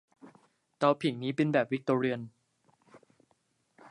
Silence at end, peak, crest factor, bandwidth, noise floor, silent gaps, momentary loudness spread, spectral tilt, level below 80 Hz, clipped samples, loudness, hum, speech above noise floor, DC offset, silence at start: 0 s; -12 dBFS; 20 dB; 11 kHz; -74 dBFS; none; 8 LU; -7 dB/octave; -78 dBFS; under 0.1%; -30 LUFS; none; 45 dB; under 0.1%; 0.25 s